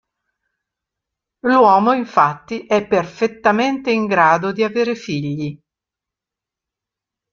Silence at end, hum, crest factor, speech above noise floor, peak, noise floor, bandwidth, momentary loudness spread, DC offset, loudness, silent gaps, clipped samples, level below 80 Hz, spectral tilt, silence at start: 1.75 s; none; 18 dB; 70 dB; 0 dBFS; -86 dBFS; 7.4 kHz; 12 LU; under 0.1%; -17 LUFS; none; under 0.1%; -60 dBFS; -6 dB/octave; 1.45 s